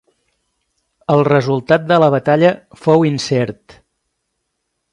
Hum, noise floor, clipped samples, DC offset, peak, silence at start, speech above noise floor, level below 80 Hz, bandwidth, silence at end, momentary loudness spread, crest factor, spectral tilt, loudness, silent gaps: none; -72 dBFS; under 0.1%; under 0.1%; 0 dBFS; 1.1 s; 59 dB; -56 dBFS; 11 kHz; 1.4 s; 7 LU; 16 dB; -6.5 dB/octave; -14 LUFS; none